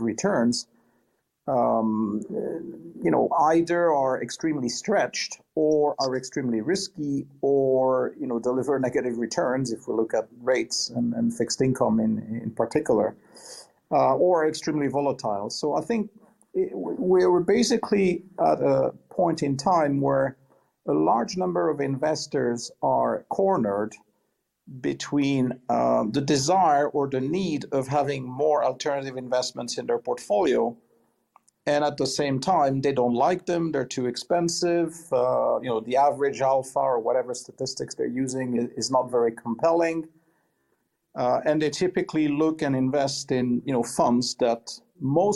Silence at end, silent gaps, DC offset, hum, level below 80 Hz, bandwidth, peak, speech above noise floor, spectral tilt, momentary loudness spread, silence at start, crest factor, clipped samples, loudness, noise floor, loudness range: 0 s; none; under 0.1%; none; -64 dBFS; 12.5 kHz; -8 dBFS; 51 dB; -5 dB/octave; 8 LU; 0 s; 16 dB; under 0.1%; -25 LUFS; -75 dBFS; 3 LU